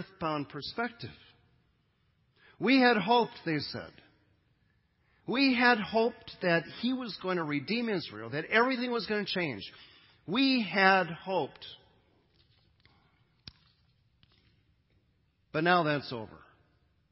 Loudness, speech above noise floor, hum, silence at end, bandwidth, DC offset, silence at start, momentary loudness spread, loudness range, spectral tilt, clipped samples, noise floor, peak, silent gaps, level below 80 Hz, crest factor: -29 LUFS; 42 dB; none; 0.75 s; 5.8 kHz; under 0.1%; 0 s; 18 LU; 5 LU; -9 dB/octave; under 0.1%; -72 dBFS; -8 dBFS; none; -70 dBFS; 24 dB